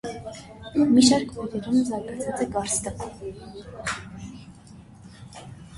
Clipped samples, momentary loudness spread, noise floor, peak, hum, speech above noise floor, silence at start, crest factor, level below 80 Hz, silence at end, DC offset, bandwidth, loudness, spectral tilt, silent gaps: under 0.1%; 24 LU; -47 dBFS; -4 dBFS; none; 23 dB; 0.05 s; 22 dB; -50 dBFS; 0 s; under 0.1%; 11.5 kHz; -24 LUFS; -4 dB/octave; none